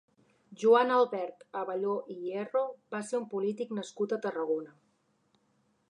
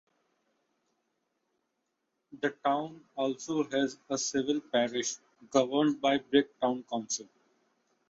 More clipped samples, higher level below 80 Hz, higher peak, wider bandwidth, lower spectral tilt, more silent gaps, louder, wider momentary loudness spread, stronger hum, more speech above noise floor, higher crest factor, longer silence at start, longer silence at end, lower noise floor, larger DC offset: neither; second, -90 dBFS vs -76 dBFS; about the same, -12 dBFS vs -10 dBFS; first, 10.5 kHz vs 7.8 kHz; first, -5 dB/octave vs -3.5 dB/octave; neither; about the same, -31 LUFS vs -31 LUFS; first, 13 LU vs 9 LU; neither; second, 42 dB vs 51 dB; about the same, 20 dB vs 22 dB; second, 0.5 s vs 2.3 s; first, 1.2 s vs 0.85 s; second, -73 dBFS vs -82 dBFS; neither